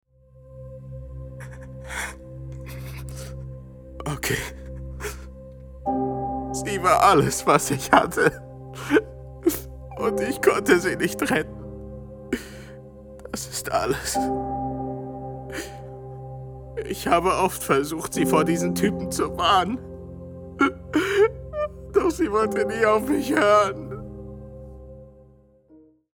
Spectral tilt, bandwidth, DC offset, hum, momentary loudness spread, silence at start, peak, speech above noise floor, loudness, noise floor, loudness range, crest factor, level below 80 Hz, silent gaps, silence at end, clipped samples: -4.5 dB/octave; over 20 kHz; under 0.1%; none; 20 LU; 0.35 s; 0 dBFS; 33 dB; -23 LUFS; -54 dBFS; 11 LU; 24 dB; -44 dBFS; none; 0.35 s; under 0.1%